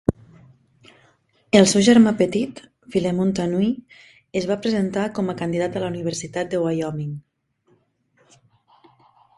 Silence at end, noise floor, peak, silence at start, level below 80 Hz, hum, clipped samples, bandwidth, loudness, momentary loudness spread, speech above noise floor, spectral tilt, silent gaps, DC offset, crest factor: 2.2 s; -63 dBFS; 0 dBFS; 0.1 s; -50 dBFS; none; under 0.1%; 11.5 kHz; -21 LUFS; 14 LU; 43 dB; -5.5 dB/octave; none; under 0.1%; 22 dB